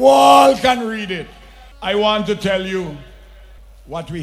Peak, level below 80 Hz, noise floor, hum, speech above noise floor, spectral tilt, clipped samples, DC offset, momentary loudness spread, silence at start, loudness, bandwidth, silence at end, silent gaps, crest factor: 0 dBFS; -42 dBFS; -41 dBFS; none; 26 dB; -4 dB/octave; under 0.1%; under 0.1%; 21 LU; 0 s; -15 LUFS; 15 kHz; 0 s; none; 16 dB